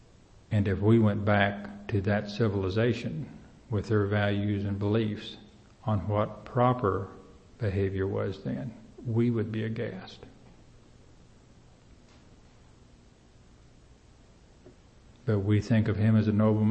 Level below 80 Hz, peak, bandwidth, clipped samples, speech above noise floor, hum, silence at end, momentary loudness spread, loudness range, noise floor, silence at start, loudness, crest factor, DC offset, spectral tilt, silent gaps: -56 dBFS; -8 dBFS; 7.8 kHz; under 0.1%; 30 dB; none; 0 s; 15 LU; 8 LU; -57 dBFS; 0.5 s; -28 LUFS; 22 dB; under 0.1%; -8.5 dB/octave; none